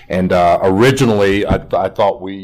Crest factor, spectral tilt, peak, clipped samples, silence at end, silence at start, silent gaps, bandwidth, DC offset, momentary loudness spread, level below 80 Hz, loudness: 10 dB; -6 dB/octave; -2 dBFS; under 0.1%; 0 s; 0.1 s; none; 15.5 kHz; under 0.1%; 5 LU; -34 dBFS; -13 LUFS